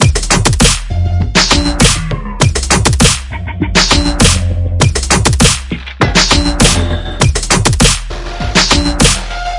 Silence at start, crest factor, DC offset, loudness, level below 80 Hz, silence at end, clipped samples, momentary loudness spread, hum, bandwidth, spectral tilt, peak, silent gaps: 0 s; 10 dB; under 0.1%; -10 LUFS; -18 dBFS; 0 s; 0.6%; 8 LU; none; 12 kHz; -3.5 dB/octave; 0 dBFS; none